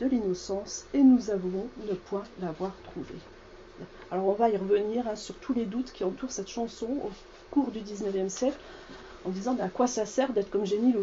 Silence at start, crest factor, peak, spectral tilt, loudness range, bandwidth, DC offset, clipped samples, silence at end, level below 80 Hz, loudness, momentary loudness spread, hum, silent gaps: 0 s; 18 dB; -12 dBFS; -5.5 dB/octave; 4 LU; 8 kHz; under 0.1%; under 0.1%; 0 s; -56 dBFS; -30 LUFS; 18 LU; none; none